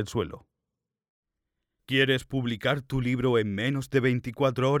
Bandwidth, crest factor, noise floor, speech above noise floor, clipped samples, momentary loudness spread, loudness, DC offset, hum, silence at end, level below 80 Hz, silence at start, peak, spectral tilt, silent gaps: 15 kHz; 18 dB; -87 dBFS; 60 dB; under 0.1%; 7 LU; -27 LUFS; under 0.1%; none; 0 s; -54 dBFS; 0 s; -10 dBFS; -6.5 dB/octave; 1.09-1.23 s